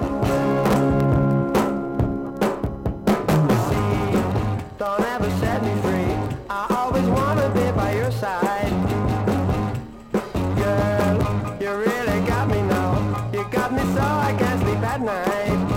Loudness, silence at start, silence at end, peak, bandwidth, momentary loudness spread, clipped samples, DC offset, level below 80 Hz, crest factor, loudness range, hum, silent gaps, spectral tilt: -22 LUFS; 0 s; 0 s; -4 dBFS; 17 kHz; 6 LU; under 0.1%; under 0.1%; -36 dBFS; 16 dB; 1 LU; none; none; -7 dB/octave